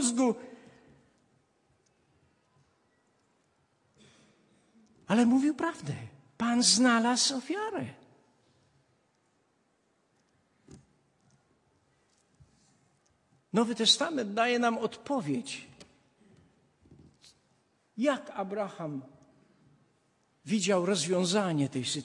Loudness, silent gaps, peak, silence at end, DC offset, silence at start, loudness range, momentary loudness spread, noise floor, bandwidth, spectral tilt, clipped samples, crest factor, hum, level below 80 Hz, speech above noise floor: -28 LUFS; none; -10 dBFS; 0 s; under 0.1%; 0 s; 11 LU; 16 LU; -73 dBFS; 11.5 kHz; -3.5 dB/octave; under 0.1%; 24 dB; none; -78 dBFS; 44 dB